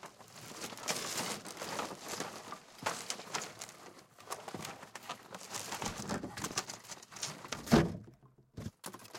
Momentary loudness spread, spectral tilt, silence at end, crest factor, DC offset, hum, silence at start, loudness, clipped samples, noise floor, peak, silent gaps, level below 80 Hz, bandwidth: 13 LU; -3.5 dB/octave; 0 s; 28 dB; under 0.1%; none; 0 s; -39 LUFS; under 0.1%; -61 dBFS; -12 dBFS; none; -60 dBFS; 17 kHz